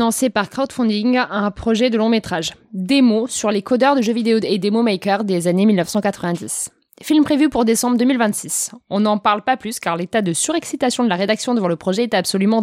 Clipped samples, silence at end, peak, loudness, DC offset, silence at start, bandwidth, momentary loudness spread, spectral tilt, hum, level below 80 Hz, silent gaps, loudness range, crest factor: under 0.1%; 0 s; -2 dBFS; -18 LUFS; under 0.1%; 0 s; 16 kHz; 7 LU; -4.5 dB/octave; none; -52 dBFS; none; 2 LU; 16 dB